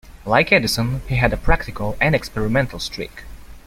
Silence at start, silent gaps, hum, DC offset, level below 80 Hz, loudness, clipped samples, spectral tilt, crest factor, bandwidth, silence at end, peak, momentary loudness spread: 0.05 s; none; none; under 0.1%; -30 dBFS; -19 LUFS; under 0.1%; -5 dB/octave; 18 dB; 16 kHz; 0.1 s; -2 dBFS; 12 LU